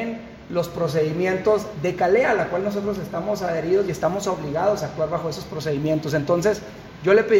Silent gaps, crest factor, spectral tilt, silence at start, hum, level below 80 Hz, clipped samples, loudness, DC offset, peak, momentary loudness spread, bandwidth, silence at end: none; 16 dB; -6 dB/octave; 0 s; none; -50 dBFS; under 0.1%; -23 LUFS; under 0.1%; -6 dBFS; 9 LU; 16.5 kHz; 0 s